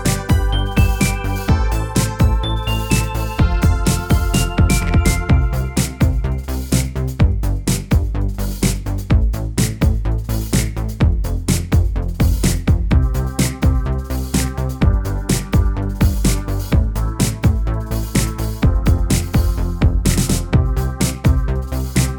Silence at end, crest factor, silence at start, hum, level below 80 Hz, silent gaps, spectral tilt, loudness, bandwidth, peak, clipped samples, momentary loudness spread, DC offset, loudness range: 0 s; 16 dB; 0 s; none; -20 dBFS; none; -5.5 dB/octave; -18 LUFS; 19.5 kHz; 0 dBFS; under 0.1%; 5 LU; under 0.1%; 2 LU